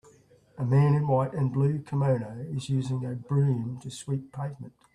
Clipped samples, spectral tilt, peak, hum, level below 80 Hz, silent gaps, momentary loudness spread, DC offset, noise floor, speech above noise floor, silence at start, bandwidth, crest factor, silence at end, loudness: under 0.1%; -8 dB/octave; -12 dBFS; none; -62 dBFS; none; 13 LU; under 0.1%; -58 dBFS; 31 dB; 0.55 s; 10.5 kHz; 14 dB; 0.25 s; -28 LUFS